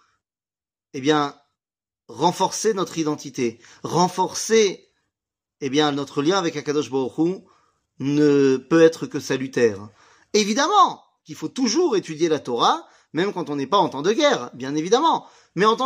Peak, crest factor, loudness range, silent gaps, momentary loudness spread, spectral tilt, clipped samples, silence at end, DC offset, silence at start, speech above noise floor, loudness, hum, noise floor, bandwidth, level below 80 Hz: -2 dBFS; 18 dB; 4 LU; none; 12 LU; -4.5 dB/octave; under 0.1%; 0 s; under 0.1%; 0.95 s; over 69 dB; -21 LUFS; none; under -90 dBFS; 15.5 kHz; -70 dBFS